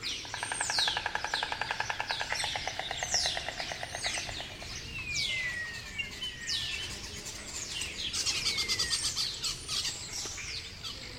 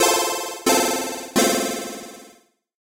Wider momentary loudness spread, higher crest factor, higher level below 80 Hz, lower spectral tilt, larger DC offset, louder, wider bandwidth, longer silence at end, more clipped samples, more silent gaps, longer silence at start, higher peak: second, 9 LU vs 15 LU; about the same, 22 dB vs 20 dB; first, -52 dBFS vs -60 dBFS; about the same, -0.5 dB/octave vs -1.5 dB/octave; neither; second, -32 LUFS vs -21 LUFS; about the same, 16 kHz vs 16.5 kHz; second, 0 s vs 0.65 s; neither; neither; about the same, 0 s vs 0 s; second, -14 dBFS vs -4 dBFS